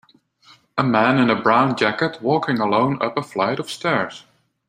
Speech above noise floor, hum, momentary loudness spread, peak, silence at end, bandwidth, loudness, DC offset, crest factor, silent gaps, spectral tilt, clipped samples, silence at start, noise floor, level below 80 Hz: 34 dB; none; 7 LU; 0 dBFS; 0.5 s; 15.5 kHz; -19 LUFS; under 0.1%; 20 dB; none; -6 dB/octave; under 0.1%; 0.75 s; -53 dBFS; -62 dBFS